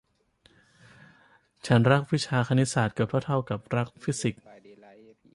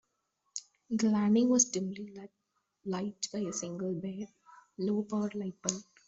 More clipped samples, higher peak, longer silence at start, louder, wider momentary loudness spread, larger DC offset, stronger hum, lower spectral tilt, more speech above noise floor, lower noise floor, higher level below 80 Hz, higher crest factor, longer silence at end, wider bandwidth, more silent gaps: neither; first, -8 dBFS vs -12 dBFS; first, 1.65 s vs 0.55 s; first, -26 LUFS vs -32 LUFS; second, 9 LU vs 18 LU; neither; neither; first, -6 dB/octave vs -4.5 dB/octave; second, 39 dB vs 48 dB; second, -64 dBFS vs -80 dBFS; first, -60 dBFS vs -74 dBFS; about the same, 20 dB vs 22 dB; first, 1 s vs 0.25 s; first, 11.5 kHz vs 8 kHz; neither